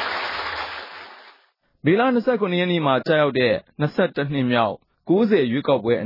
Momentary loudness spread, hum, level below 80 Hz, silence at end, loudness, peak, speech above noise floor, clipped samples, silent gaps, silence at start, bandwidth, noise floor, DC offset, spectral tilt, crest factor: 13 LU; none; -60 dBFS; 0 s; -21 LUFS; -6 dBFS; 41 dB; under 0.1%; none; 0 s; 5.8 kHz; -60 dBFS; under 0.1%; -8.5 dB/octave; 14 dB